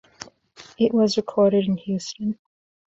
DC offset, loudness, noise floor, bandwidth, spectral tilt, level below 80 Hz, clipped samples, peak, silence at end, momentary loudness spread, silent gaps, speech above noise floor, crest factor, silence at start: under 0.1%; -22 LUFS; -49 dBFS; 8 kHz; -6 dB/octave; -62 dBFS; under 0.1%; -8 dBFS; 0.5 s; 22 LU; none; 28 dB; 16 dB; 0.2 s